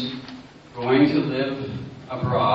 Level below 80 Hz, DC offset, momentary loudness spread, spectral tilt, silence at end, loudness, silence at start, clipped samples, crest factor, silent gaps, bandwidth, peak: -54 dBFS; under 0.1%; 21 LU; -8 dB/octave; 0 s; -23 LUFS; 0 s; under 0.1%; 18 dB; none; 7 kHz; -6 dBFS